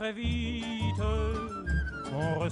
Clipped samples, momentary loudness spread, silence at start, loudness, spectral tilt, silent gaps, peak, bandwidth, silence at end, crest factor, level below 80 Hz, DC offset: under 0.1%; 3 LU; 0 s; -32 LUFS; -6.5 dB/octave; none; -20 dBFS; 10.5 kHz; 0 s; 12 dB; -36 dBFS; under 0.1%